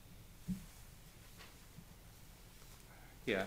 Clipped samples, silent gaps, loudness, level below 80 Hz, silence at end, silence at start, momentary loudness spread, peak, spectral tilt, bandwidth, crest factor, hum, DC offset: under 0.1%; none; -51 LUFS; -60 dBFS; 0 s; 0 s; 12 LU; -22 dBFS; -5 dB/octave; 16 kHz; 26 dB; none; under 0.1%